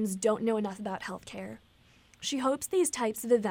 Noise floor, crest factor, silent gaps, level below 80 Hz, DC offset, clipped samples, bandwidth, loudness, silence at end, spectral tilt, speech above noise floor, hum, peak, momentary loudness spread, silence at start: -61 dBFS; 18 dB; none; -68 dBFS; under 0.1%; under 0.1%; 19 kHz; -31 LUFS; 0 s; -4 dB/octave; 31 dB; none; -14 dBFS; 14 LU; 0 s